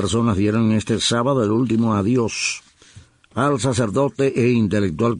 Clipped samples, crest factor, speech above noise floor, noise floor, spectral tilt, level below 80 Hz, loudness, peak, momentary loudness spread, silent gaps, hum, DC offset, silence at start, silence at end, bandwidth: under 0.1%; 12 dB; 29 dB; -47 dBFS; -5.5 dB/octave; -48 dBFS; -19 LUFS; -6 dBFS; 4 LU; none; none; under 0.1%; 0 s; 0 s; 11 kHz